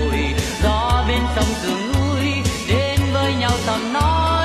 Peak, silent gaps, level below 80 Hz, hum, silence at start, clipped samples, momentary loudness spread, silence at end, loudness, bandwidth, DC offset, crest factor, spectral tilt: -4 dBFS; none; -26 dBFS; none; 0 s; under 0.1%; 3 LU; 0 s; -19 LUFS; 14.5 kHz; under 0.1%; 14 dB; -5 dB/octave